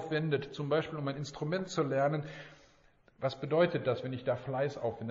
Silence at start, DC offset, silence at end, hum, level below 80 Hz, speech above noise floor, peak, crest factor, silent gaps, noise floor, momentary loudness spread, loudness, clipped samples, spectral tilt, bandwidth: 0 s; under 0.1%; 0 s; none; -68 dBFS; 32 dB; -16 dBFS; 18 dB; none; -65 dBFS; 9 LU; -34 LUFS; under 0.1%; -5.5 dB/octave; 7.4 kHz